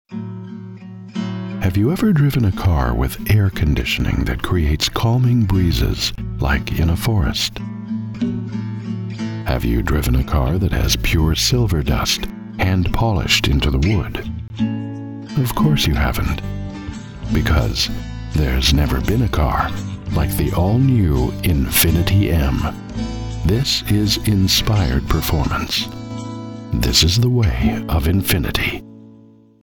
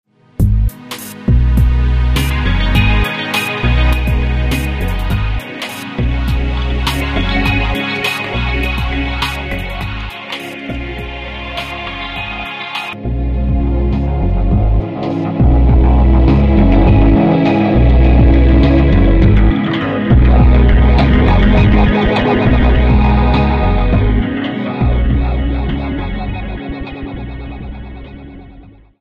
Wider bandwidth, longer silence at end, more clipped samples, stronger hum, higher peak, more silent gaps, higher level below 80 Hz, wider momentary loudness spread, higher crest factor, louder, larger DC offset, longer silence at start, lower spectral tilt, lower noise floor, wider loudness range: first, 20 kHz vs 15 kHz; first, 0.55 s vs 0.3 s; neither; neither; about the same, 0 dBFS vs 0 dBFS; neither; second, -24 dBFS vs -14 dBFS; about the same, 12 LU vs 14 LU; first, 18 dB vs 12 dB; second, -18 LUFS vs -14 LUFS; neither; second, 0.1 s vs 0.4 s; second, -5 dB/octave vs -7 dB/octave; first, -46 dBFS vs -39 dBFS; second, 4 LU vs 11 LU